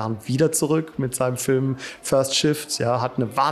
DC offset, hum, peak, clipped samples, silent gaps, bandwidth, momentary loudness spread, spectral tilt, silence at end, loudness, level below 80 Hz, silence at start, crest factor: under 0.1%; none; -6 dBFS; under 0.1%; none; 14.5 kHz; 6 LU; -4.5 dB/octave; 0 s; -22 LUFS; -58 dBFS; 0 s; 16 dB